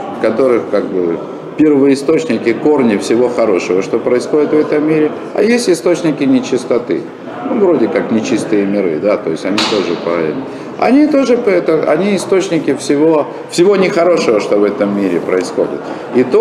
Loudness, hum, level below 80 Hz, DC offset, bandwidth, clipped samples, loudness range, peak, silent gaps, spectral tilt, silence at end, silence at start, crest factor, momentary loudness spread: -13 LUFS; none; -56 dBFS; under 0.1%; 13 kHz; under 0.1%; 2 LU; 0 dBFS; none; -5.5 dB/octave; 0 s; 0 s; 12 dB; 6 LU